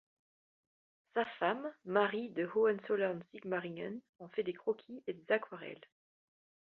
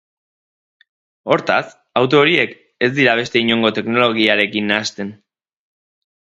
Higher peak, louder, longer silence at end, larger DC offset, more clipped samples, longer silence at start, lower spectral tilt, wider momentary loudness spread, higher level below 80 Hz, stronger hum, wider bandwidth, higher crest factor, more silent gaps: second, -16 dBFS vs 0 dBFS; second, -37 LUFS vs -16 LUFS; about the same, 1 s vs 1.05 s; neither; neither; about the same, 1.15 s vs 1.25 s; about the same, -3.5 dB/octave vs -4.5 dB/octave; first, 13 LU vs 10 LU; second, -84 dBFS vs -60 dBFS; neither; second, 4.3 kHz vs 8.2 kHz; about the same, 22 dB vs 18 dB; first, 4.09-4.13 s vs none